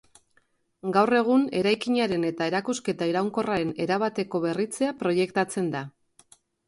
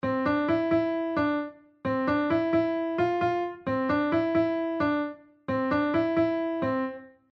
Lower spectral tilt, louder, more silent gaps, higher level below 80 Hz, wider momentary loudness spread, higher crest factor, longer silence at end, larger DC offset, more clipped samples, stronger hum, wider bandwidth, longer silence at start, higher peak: second, -5.5 dB/octave vs -8.5 dB/octave; about the same, -26 LUFS vs -27 LUFS; neither; second, -66 dBFS vs -58 dBFS; about the same, 7 LU vs 7 LU; first, 18 dB vs 12 dB; first, 0.8 s vs 0.25 s; neither; neither; neither; first, 11.5 kHz vs 6 kHz; first, 0.85 s vs 0.05 s; first, -8 dBFS vs -14 dBFS